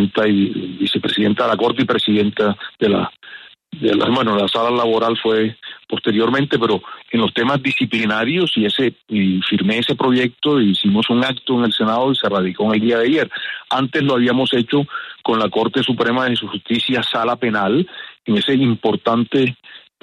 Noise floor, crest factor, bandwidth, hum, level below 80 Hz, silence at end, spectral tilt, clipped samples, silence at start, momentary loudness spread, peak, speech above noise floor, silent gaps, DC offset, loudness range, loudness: -40 dBFS; 14 dB; 11.5 kHz; none; -58 dBFS; 0.25 s; -6.5 dB/octave; under 0.1%; 0 s; 6 LU; -4 dBFS; 23 dB; none; under 0.1%; 2 LU; -17 LUFS